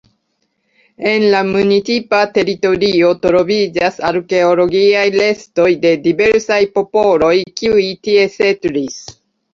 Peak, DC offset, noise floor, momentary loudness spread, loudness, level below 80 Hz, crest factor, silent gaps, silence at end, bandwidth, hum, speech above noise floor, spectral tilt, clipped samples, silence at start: 0 dBFS; under 0.1%; -66 dBFS; 4 LU; -13 LUFS; -50 dBFS; 12 dB; none; 0.4 s; 7.4 kHz; none; 53 dB; -5 dB/octave; under 0.1%; 1 s